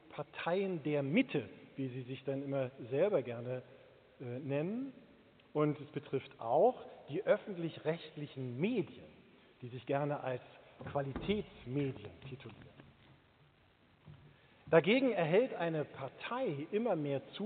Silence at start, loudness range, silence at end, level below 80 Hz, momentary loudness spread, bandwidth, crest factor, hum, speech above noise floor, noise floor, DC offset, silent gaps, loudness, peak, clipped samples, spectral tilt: 0.1 s; 8 LU; 0 s; -70 dBFS; 17 LU; 4.6 kHz; 24 dB; none; 32 dB; -68 dBFS; under 0.1%; none; -37 LUFS; -14 dBFS; under 0.1%; -5.5 dB/octave